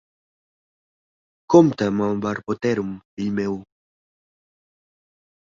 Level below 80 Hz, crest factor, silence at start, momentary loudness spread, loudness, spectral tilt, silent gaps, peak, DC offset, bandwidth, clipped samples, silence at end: -60 dBFS; 22 dB; 1.5 s; 14 LU; -21 LUFS; -7 dB/octave; 3.05-3.17 s; -2 dBFS; under 0.1%; 7.4 kHz; under 0.1%; 1.95 s